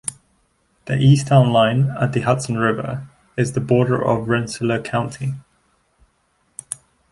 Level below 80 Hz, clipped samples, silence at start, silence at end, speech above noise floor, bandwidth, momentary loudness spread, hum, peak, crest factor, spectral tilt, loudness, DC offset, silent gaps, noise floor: -52 dBFS; under 0.1%; 0.05 s; 0.4 s; 47 dB; 11.5 kHz; 18 LU; none; -2 dBFS; 18 dB; -6.5 dB/octave; -19 LUFS; under 0.1%; none; -64 dBFS